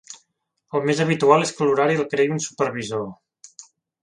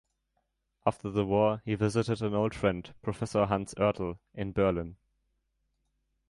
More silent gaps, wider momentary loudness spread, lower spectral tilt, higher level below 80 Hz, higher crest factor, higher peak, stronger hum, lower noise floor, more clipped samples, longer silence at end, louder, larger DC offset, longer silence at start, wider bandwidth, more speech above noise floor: neither; first, 14 LU vs 9 LU; second, -5 dB/octave vs -7 dB/octave; second, -66 dBFS vs -54 dBFS; about the same, 22 dB vs 22 dB; first, 0 dBFS vs -10 dBFS; neither; second, -72 dBFS vs -79 dBFS; neither; second, 0.4 s vs 1.35 s; first, -21 LUFS vs -30 LUFS; neither; second, 0.1 s vs 0.85 s; about the same, 11 kHz vs 11.5 kHz; about the same, 52 dB vs 49 dB